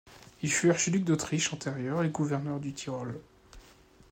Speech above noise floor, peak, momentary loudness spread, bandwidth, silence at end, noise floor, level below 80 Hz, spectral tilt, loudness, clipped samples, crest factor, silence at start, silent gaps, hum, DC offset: 28 dB; -14 dBFS; 11 LU; 16 kHz; 0.5 s; -58 dBFS; -62 dBFS; -4.5 dB/octave; -30 LUFS; under 0.1%; 18 dB; 0.05 s; none; none; under 0.1%